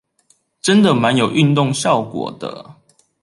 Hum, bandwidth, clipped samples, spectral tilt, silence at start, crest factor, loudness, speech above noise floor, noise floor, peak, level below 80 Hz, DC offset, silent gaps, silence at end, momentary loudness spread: none; 11.5 kHz; under 0.1%; -5.5 dB/octave; 0.65 s; 16 dB; -16 LUFS; 44 dB; -59 dBFS; -2 dBFS; -58 dBFS; under 0.1%; none; 0.5 s; 16 LU